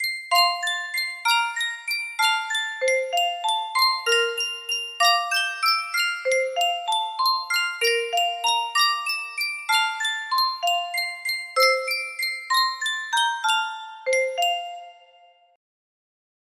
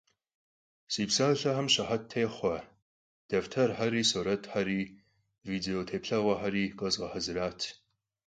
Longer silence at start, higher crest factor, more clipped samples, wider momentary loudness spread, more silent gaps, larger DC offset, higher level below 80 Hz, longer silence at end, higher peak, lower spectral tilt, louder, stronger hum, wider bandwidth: second, 0 s vs 0.9 s; about the same, 20 dB vs 20 dB; neither; about the same, 7 LU vs 9 LU; second, none vs 2.82-3.29 s; neither; second, -78 dBFS vs -62 dBFS; first, 1.6 s vs 0.55 s; first, -6 dBFS vs -12 dBFS; second, 3.5 dB/octave vs -4 dB/octave; first, -22 LUFS vs -31 LUFS; neither; first, 16 kHz vs 9.6 kHz